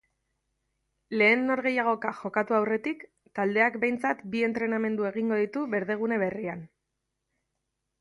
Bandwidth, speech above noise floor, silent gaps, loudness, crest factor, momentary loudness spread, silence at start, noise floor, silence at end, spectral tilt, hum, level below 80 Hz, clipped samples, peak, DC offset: 11 kHz; 55 dB; none; -27 LUFS; 20 dB; 11 LU; 1.1 s; -82 dBFS; 1.35 s; -7 dB/octave; none; -72 dBFS; under 0.1%; -10 dBFS; under 0.1%